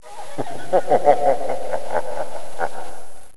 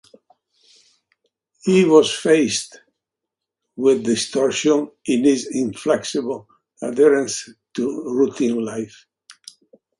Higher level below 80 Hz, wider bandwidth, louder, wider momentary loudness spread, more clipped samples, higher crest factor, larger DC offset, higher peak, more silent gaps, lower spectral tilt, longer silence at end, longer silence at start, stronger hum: first, -54 dBFS vs -66 dBFS; about the same, 11 kHz vs 11.5 kHz; second, -22 LUFS vs -19 LUFS; first, 17 LU vs 14 LU; neither; about the same, 20 dB vs 20 dB; first, 10% vs under 0.1%; about the same, 0 dBFS vs 0 dBFS; neither; about the same, -5 dB/octave vs -4.5 dB/octave; second, 0 s vs 0.65 s; second, 0 s vs 1.65 s; neither